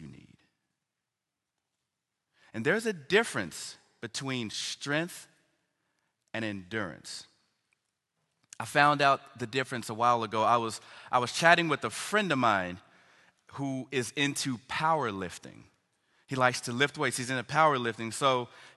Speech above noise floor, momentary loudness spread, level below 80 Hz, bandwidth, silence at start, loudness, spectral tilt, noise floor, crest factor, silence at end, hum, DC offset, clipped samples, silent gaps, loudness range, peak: 58 dB; 16 LU; -68 dBFS; 12.5 kHz; 0 s; -29 LUFS; -4 dB/octave; -87 dBFS; 26 dB; 0.05 s; none; under 0.1%; under 0.1%; none; 10 LU; -4 dBFS